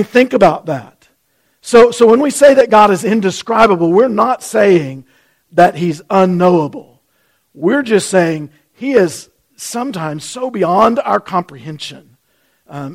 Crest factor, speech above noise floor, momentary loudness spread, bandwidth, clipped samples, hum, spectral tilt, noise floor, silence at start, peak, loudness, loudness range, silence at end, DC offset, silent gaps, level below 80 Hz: 12 dB; 49 dB; 18 LU; 15.5 kHz; under 0.1%; none; -5.5 dB/octave; -61 dBFS; 0 s; 0 dBFS; -12 LUFS; 7 LU; 0 s; under 0.1%; none; -50 dBFS